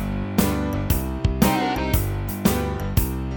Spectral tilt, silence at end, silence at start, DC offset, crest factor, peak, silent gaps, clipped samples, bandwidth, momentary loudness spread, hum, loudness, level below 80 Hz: -5.5 dB/octave; 0 s; 0 s; under 0.1%; 18 dB; -4 dBFS; none; under 0.1%; over 20 kHz; 5 LU; none; -23 LUFS; -28 dBFS